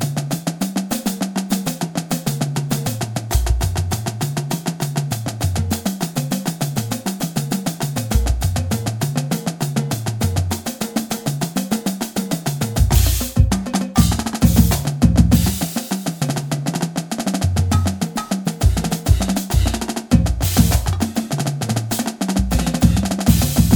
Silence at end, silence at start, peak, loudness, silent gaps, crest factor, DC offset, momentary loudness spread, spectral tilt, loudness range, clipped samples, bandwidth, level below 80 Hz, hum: 0 s; 0 s; 0 dBFS; -20 LUFS; none; 18 dB; under 0.1%; 7 LU; -5 dB/octave; 5 LU; under 0.1%; over 20 kHz; -26 dBFS; none